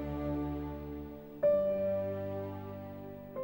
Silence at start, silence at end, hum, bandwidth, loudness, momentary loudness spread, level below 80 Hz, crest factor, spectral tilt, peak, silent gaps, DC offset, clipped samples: 0 s; 0 s; none; 16.5 kHz; -36 LUFS; 15 LU; -52 dBFS; 16 dB; -10 dB/octave; -20 dBFS; none; under 0.1%; under 0.1%